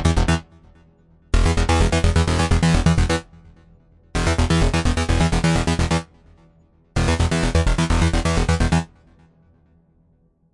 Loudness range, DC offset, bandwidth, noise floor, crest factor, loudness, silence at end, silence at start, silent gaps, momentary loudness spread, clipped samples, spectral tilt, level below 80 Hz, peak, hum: 1 LU; under 0.1%; 11.5 kHz; -59 dBFS; 18 dB; -20 LUFS; 1.65 s; 0 s; none; 6 LU; under 0.1%; -5.5 dB/octave; -26 dBFS; -2 dBFS; none